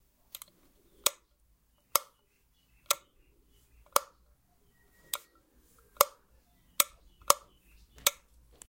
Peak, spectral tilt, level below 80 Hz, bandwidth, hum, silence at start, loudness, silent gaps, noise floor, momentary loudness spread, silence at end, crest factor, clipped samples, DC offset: -2 dBFS; 1 dB/octave; -66 dBFS; 16.5 kHz; none; 1.05 s; -31 LUFS; none; -70 dBFS; 20 LU; 0.6 s; 34 dB; under 0.1%; under 0.1%